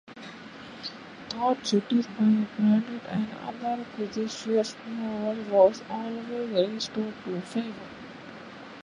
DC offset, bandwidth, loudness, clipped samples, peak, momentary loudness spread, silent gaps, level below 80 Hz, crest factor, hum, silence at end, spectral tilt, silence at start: under 0.1%; 10 kHz; -28 LUFS; under 0.1%; -8 dBFS; 19 LU; none; -68 dBFS; 22 dB; none; 0 s; -6 dB/octave; 0.05 s